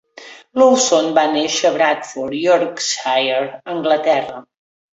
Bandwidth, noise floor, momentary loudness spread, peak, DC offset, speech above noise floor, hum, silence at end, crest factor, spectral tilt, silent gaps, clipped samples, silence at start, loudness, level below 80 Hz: 8 kHz; -40 dBFS; 11 LU; -2 dBFS; under 0.1%; 24 dB; none; 0.55 s; 16 dB; -2 dB/octave; none; under 0.1%; 0.2 s; -16 LUFS; -64 dBFS